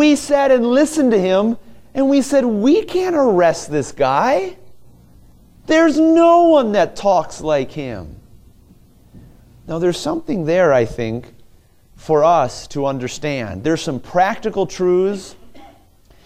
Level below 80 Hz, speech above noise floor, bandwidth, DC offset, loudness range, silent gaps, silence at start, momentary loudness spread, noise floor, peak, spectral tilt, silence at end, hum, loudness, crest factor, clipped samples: -46 dBFS; 34 dB; 15 kHz; under 0.1%; 6 LU; none; 0 s; 12 LU; -50 dBFS; -2 dBFS; -5.5 dB/octave; 0.6 s; none; -16 LUFS; 16 dB; under 0.1%